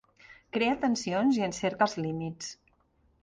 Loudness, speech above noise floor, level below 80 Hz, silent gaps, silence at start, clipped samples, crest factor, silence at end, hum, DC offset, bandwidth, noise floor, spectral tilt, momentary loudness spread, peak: -29 LUFS; 39 dB; -64 dBFS; none; 0.3 s; under 0.1%; 20 dB; 0.7 s; none; under 0.1%; 10 kHz; -68 dBFS; -5 dB/octave; 10 LU; -10 dBFS